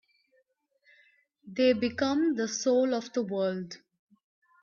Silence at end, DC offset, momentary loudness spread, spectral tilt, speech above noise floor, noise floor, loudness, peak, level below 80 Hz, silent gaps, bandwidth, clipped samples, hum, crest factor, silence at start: 0.85 s; under 0.1%; 14 LU; -4.5 dB/octave; 45 dB; -73 dBFS; -28 LUFS; -14 dBFS; -74 dBFS; none; 7.4 kHz; under 0.1%; none; 18 dB; 1.45 s